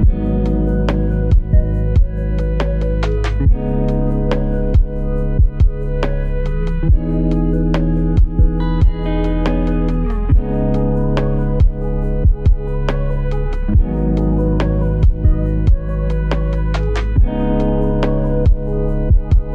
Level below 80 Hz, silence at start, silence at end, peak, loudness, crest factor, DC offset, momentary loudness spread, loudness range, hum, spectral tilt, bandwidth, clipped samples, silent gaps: -16 dBFS; 0 s; 0 s; -2 dBFS; -18 LUFS; 12 dB; under 0.1%; 4 LU; 1 LU; none; -9.5 dB/octave; 5.6 kHz; under 0.1%; none